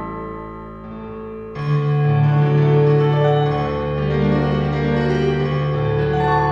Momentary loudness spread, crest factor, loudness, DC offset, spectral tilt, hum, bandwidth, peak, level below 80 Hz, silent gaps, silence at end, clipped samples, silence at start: 16 LU; 14 dB; -18 LUFS; 0.2%; -9 dB/octave; none; 6 kHz; -4 dBFS; -36 dBFS; none; 0 s; under 0.1%; 0 s